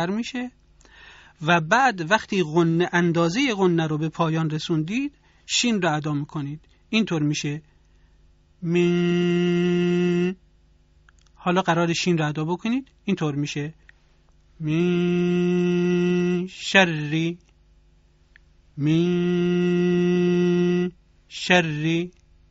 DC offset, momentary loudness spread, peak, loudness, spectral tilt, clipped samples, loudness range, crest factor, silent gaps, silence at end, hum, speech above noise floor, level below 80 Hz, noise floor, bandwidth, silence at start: under 0.1%; 11 LU; -2 dBFS; -22 LUFS; -5 dB/octave; under 0.1%; 4 LU; 22 dB; none; 0.4 s; none; 35 dB; -58 dBFS; -57 dBFS; 8 kHz; 0 s